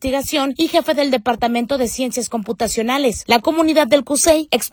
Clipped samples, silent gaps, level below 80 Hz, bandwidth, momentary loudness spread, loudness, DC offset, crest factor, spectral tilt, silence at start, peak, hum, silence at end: under 0.1%; none; -44 dBFS; 19 kHz; 7 LU; -17 LUFS; under 0.1%; 16 dB; -2.5 dB/octave; 0 s; 0 dBFS; none; 0.05 s